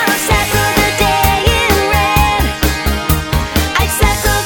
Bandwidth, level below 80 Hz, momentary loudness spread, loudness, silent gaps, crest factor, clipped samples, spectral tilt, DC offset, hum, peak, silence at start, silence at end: 19.5 kHz; -20 dBFS; 4 LU; -12 LUFS; none; 12 dB; under 0.1%; -3.5 dB/octave; under 0.1%; none; 0 dBFS; 0 s; 0 s